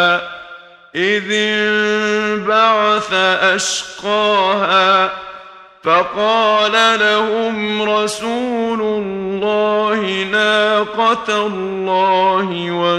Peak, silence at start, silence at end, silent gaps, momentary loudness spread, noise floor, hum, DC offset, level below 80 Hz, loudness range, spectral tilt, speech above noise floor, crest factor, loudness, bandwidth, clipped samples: 0 dBFS; 0 s; 0 s; none; 8 LU; -38 dBFS; none; under 0.1%; -56 dBFS; 3 LU; -3 dB/octave; 23 dB; 14 dB; -15 LUFS; 12.5 kHz; under 0.1%